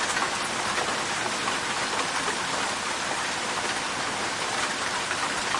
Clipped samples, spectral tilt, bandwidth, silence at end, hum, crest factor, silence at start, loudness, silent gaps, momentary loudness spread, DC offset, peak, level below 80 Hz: under 0.1%; -1 dB/octave; 11.5 kHz; 0 s; none; 16 dB; 0 s; -26 LUFS; none; 2 LU; under 0.1%; -12 dBFS; -58 dBFS